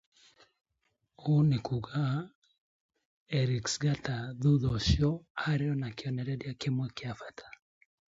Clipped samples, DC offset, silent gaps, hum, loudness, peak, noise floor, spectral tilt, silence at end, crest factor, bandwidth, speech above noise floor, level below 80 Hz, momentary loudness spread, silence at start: under 0.1%; under 0.1%; 2.35-2.42 s, 2.58-2.89 s, 3.05-3.26 s, 5.30-5.35 s; none; -32 LUFS; -14 dBFS; -79 dBFS; -6 dB/octave; 0.6 s; 18 dB; 7.8 kHz; 49 dB; -48 dBFS; 12 LU; 1.2 s